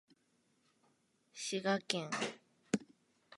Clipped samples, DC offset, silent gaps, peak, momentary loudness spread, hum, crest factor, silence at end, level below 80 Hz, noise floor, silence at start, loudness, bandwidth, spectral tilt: under 0.1%; under 0.1%; none; -14 dBFS; 13 LU; none; 28 dB; 0 s; -82 dBFS; -77 dBFS; 1.35 s; -39 LUFS; 11.5 kHz; -3.5 dB/octave